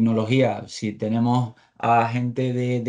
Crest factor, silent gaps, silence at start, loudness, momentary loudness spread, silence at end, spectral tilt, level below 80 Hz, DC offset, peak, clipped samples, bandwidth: 14 dB; none; 0 s; -23 LUFS; 8 LU; 0 s; -7.5 dB/octave; -66 dBFS; under 0.1%; -6 dBFS; under 0.1%; 9.6 kHz